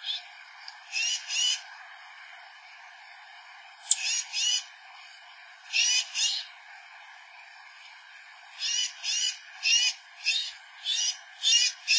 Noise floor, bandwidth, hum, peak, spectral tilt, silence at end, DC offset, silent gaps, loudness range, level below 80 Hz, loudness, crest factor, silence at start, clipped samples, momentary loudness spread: -50 dBFS; 8 kHz; none; -6 dBFS; 10 dB/octave; 0 s; under 0.1%; none; 5 LU; under -90 dBFS; -26 LUFS; 26 dB; 0 s; under 0.1%; 25 LU